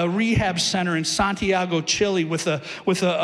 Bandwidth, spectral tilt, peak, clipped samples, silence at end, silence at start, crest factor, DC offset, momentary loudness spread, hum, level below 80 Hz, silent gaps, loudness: 13.5 kHz; -4 dB/octave; -10 dBFS; under 0.1%; 0 s; 0 s; 12 dB; under 0.1%; 4 LU; none; -46 dBFS; none; -22 LUFS